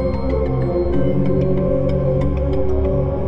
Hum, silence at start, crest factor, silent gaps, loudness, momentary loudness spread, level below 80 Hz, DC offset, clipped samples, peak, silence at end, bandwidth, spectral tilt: none; 0 s; 12 dB; none; -19 LUFS; 2 LU; -26 dBFS; under 0.1%; under 0.1%; -6 dBFS; 0 s; 5.6 kHz; -11 dB/octave